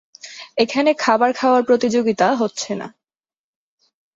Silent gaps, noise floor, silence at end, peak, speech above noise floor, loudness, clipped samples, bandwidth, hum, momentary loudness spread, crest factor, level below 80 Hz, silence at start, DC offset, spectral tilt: none; under -90 dBFS; 1.25 s; -2 dBFS; over 73 dB; -18 LUFS; under 0.1%; 7.8 kHz; none; 14 LU; 16 dB; -64 dBFS; 0.25 s; under 0.1%; -4 dB/octave